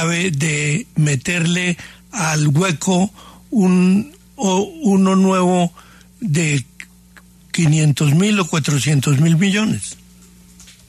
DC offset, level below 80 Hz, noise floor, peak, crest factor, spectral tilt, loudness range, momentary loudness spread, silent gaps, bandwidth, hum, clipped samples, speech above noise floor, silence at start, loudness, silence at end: under 0.1%; -52 dBFS; -46 dBFS; -6 dBFS; 12 dB; -5.5 dB/octave; 2 LU; 9 LU; none; 13.5 kHz; 60 Hz at -35 dBFS; under 0.1%; 30 dB; 0 s; -17 LUFS; 0.95 s